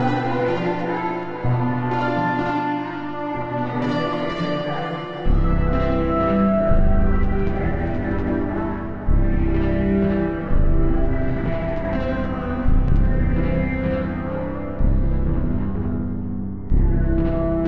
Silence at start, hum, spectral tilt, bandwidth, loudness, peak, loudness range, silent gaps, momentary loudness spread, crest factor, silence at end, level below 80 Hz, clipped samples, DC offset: 0 s; none; -9.5 dB/octave; 5.6 kHz; -22 LUFS; -6 dBFS; 3 LU; none; 6 LU; 14 dB; 0 s; -22 dBFS; under 0.1%; 1%